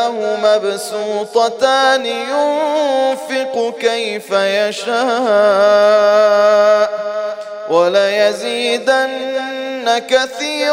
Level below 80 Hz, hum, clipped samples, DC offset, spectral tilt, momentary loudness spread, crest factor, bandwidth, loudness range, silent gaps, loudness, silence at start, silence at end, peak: -70 dBFS; none; under 0.1%; under 0.1%; -2.5 dB/octave; 10 LU; 12 dB; 15.5 kHz; 4 LU; none; -14 LUFS; 0 s; 0 s; -2 dBFS